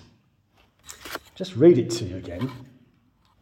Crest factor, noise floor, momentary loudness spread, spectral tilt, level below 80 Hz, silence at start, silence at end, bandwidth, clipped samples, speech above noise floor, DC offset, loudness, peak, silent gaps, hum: 22 dB; -63 dBFS; 24 LU; -6.5 dB/octave; -58 dBFS; 0.9 s; 0.8 s; 16 kHz; under 0.1%; 41 dB; under 0.1%; -22 LUFS; -4 dBFS; none; none